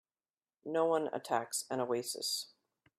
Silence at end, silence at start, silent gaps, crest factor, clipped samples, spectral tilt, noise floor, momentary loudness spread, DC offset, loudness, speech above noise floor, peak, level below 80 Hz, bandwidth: 0.5 s; 0.65 s; none; 18 dB; under 0.1%; -2.5 dB/octave; under -90 dBFS; 7 LU; under 0.1%; -35 LUFS; over 55 dB; -18 dBFS; -86 dBFS; 15.5 kHz